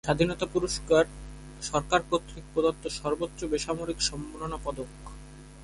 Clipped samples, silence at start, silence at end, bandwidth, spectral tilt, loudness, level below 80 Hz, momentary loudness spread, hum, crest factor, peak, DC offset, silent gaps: under 0.1%; 0.05 s; 0 s; 11.5 kHz; -4 dB/octave; -29 LUFS; -46 dBFS; 20 LU; none; 20 dB; -8 dBFS; under 0.1%; none